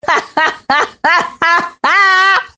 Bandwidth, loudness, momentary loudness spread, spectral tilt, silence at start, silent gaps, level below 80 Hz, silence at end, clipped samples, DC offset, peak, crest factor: 9.6 kHz; -11 LUFS; 6 LU; -1.5 dB/octave; 0.05 s; none; -56 dBFS; 0.1 s; under 0.1%; under 0.1%; 0 dBFS; 12 dB